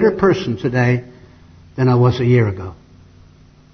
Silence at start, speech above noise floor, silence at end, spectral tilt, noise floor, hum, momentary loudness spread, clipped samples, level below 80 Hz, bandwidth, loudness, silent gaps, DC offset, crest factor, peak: 0 s; 31 dB; 1 s; -8.5 dB/octave; -46 dBFS; none; 15 LU; under 0.1%; -46 dBFS; 6.4 kHz; -16 LUFS; none; under 0.1%; 16 dB; 0 dBFS